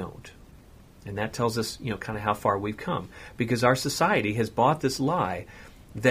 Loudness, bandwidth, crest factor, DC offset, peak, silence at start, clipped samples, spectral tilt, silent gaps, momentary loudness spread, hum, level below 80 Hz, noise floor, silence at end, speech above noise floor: -27 LUFS; 15.5 kHz; 22 dB; under 0.1%; -6 dBFS; 0 s; under 0.1%; -5 dB/octave; none; 16 LU; none; -52 dBFS; -51 dBFS; 0 s; 24 dB